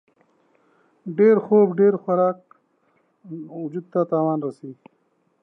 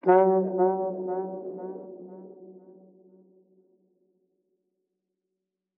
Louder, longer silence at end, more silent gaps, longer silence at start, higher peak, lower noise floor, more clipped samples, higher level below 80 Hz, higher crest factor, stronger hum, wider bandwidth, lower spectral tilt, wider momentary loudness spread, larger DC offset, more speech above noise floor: first, -20 LUFS vs -26 LUFS; second, 0.7 s vs 3.2 s; neither; first, 1.05 s vs 0.05 s; about the same, -6 dBFS vs -8 dBFS; second, -65 dBFS vs -85 dBFS; neither; first, -80 dBFS vs under -90 dBFS; about the same, 18 dB vs 22 dB; neither; second, 2.5 kHz vs 3.1 kHz; about the same, -11 dB/octave vs -12 dB/octave; second, 22 LU vs 26 LU; neither; second, 45 dB vs 62 dB